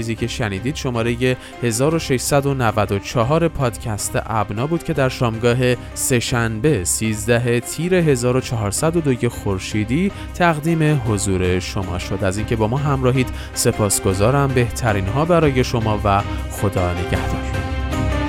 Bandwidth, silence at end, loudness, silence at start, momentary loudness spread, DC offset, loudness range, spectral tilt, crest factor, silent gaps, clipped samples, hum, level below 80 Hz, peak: 16.5 kHz; 0 s; -19 LUFS; 0 s; 6 LU; under 0.1%; 2 LU; -5 dB/octave; 16 dB; none; under 0.1%; none; -32 dBFS; -2 dBFS